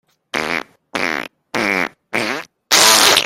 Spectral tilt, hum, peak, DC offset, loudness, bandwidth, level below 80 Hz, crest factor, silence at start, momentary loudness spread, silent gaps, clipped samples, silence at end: -0.5 dB/octave; none; 0 dBFS; under 0.1%; -15 LUFS; over 20 kHz; -58 dBFS; 18 dB; 0.35 s; 16 LU; none; under 0.1%; 0 s